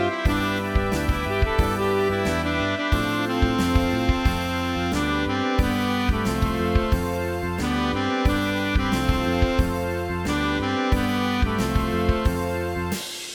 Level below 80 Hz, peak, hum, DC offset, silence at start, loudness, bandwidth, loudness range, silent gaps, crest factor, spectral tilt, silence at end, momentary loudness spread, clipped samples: -28 dBFS; -6 dBFS; none; under 0.1%; 0 s; -23 LUFS; 20 kHz; 1 LU; none; 16 dB; -5.5 dB/octave; 0 s; 4 LU; under 0.1%